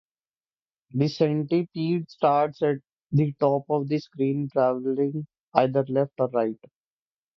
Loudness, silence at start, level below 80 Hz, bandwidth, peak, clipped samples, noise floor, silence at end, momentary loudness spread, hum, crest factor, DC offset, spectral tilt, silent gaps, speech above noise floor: -25 LUFS; 0.95 s; -66 dBFS; 6.4 kHz; -4 dBFS; under 0.1%; under -90 dBFS; 0.8 s; 6 LU; none; 22 dB; under 0.1%; -9 dB/octave; 5.40-5.52 s; over 66 dB